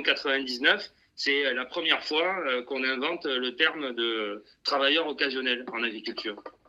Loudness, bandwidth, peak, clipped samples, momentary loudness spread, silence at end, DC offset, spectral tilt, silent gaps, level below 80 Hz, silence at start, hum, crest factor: -27 LUFS; 12 kHz; -6 dBFS; under 0.1%; 9 LU; 0.2 s; under 0.1%; -2.5 dB/octave; none; -74 dBFS; 0 s; none; 22 dB